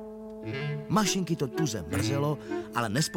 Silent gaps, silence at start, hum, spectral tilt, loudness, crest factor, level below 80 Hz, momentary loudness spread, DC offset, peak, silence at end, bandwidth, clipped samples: none; 0 s; none; -4.5 dB/octave; -30 LUFS; 18 dB; -56 dBFS; 9 LU; under 0.1%; -12 dBFS; 0 s; 17 kHz; under 0.1%